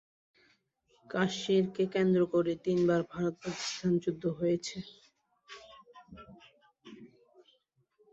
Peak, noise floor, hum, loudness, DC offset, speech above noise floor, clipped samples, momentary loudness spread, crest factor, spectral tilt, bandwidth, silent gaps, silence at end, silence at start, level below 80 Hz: -14 dBFS; -73 dBFS; none; -31 LUFS; under 0.1%; 43 dB; under 0.1%; 24 LU; 20 dB; -6 dB/octave; 8 kHz; none; 1.05 s; 1.1 s; -70 dBFS